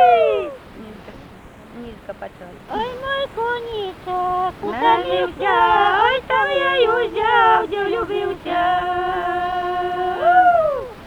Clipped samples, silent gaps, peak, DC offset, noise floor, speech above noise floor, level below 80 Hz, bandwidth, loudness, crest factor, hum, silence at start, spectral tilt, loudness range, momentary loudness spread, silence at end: under 0.1%; none; -2 dBFS; under 0.1%; -41 dBFS; 22 dB; -46 dBFS; 11 kHz; -18 LUFS; 16 dB; none; 0 s; -5 dB/octave; 11 LU; 20 LU; 0 s